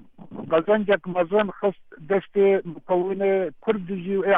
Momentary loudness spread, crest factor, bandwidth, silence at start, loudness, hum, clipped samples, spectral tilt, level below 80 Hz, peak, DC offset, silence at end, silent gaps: 7 LU; 16 dB; 3.9 kHz; 0.2 s; -23 LUFS; none; under 0.1%; -9 dB/octave; -62 dBFS; -8 dBFS; under 0.1%; 0 s; none